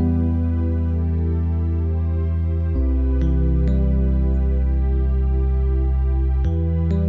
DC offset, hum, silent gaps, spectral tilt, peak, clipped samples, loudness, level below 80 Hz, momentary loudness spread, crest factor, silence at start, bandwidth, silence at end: under 0.1%; none; none; -11.5 dB/octave; -10 dBFS; under 0.1%; -21 LUFS; -20 dBFS; 2 LU; 8 dB; 0 s; 3.2 kHz; 0 s